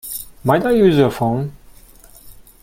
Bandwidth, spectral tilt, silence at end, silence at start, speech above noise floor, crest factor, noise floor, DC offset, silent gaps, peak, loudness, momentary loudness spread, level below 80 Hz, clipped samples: 16.5 kHz; -6.5 dB/octave; 0.3 s; 0.05 s; 29 dB; 18 dB; -44 dBFS; under 0.1%; none; 0 dBFS; -16 LUFS; 14 LU; -44 dBFS; under 0.1%